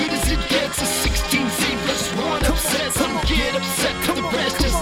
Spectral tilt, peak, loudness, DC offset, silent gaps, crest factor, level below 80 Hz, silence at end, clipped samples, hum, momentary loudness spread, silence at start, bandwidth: -3 dB/octave; -4 dBFS; -20 LUFS; under 0.1%; none; 16 dB; -28 dBFS; 0 s; under 0.1%; none; 2 LU; 0 s; 18 kHz